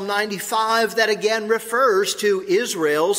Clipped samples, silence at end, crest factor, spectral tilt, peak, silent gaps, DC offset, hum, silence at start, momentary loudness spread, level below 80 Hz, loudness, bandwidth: under 0.1%; 0 s; 18 dB; -2.5 dB/octave; -2 dBFS; none; under 0.1%; none; 0 s; 4 LU; -68 dBFS; -20 LUFS; 16 kHz